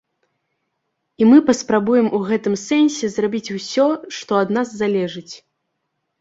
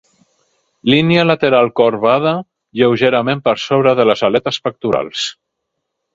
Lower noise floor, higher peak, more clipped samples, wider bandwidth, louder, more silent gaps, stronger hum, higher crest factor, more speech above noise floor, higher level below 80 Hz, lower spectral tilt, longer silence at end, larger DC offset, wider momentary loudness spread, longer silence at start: about the same, -74 dBFS vs -75 dBFS; about the same, -2 dBFS vs 0 dBFS; neither; about the same, 8 kHz vs 7.8 kHz; second, -18 LUFS vs -14 LUFS; neither; neither; about the same, 16 dB vs 14 dB; second, 57 dB vs 61 dB; second, -62 dBFS vs -54 dBFS; about the same, -5 dB/octave vs -6 dB/octave; about the same, 0.85 s vs 0.8 s; neither; first, 13 LU vs 9 LU; first, 1.2 s vs 0.85 s